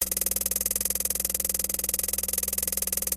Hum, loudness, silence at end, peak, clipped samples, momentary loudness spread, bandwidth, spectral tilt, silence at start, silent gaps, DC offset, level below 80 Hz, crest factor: none; -25 LUFS; 0 s; -8 dBFS; under 0.1%; 1 LU; 17 kHz; -1 dB/octave; 0 s; none; under 0.1%; -46 dBFS; 20 dB